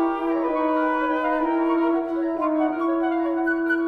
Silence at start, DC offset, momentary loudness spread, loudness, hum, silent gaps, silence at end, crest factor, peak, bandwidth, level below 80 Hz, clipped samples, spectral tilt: 0 s; under 0.1%; 2 LU; -23 LUFS; none; none; 0 s; 12 dB; -10 dBFS; 4.7 kHz; -54 dBFS; under 0.1%; -6.5 dB/octave